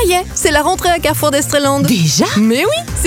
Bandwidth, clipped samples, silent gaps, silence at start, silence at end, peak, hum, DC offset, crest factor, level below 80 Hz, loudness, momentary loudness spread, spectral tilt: 17.5 kHz; under 0.1%; none; 0 s; 0 s; 0 dBFS; none; under 0.1%; 12 dB; -30 dBFS; -13 LUFS; 2 LU; -4 dB/octave